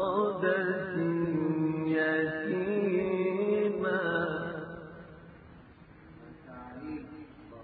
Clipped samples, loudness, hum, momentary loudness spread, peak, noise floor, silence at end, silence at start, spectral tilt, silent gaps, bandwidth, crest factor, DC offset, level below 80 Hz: under 0.1%; -30 LUFS; none; 20 LU; -14 dBFS; -54 dBFS; 0 s; 0 s; -10.5 dB/octave; none; 4.7 kHz; 18 dB; under 0.1%; -62 dBFS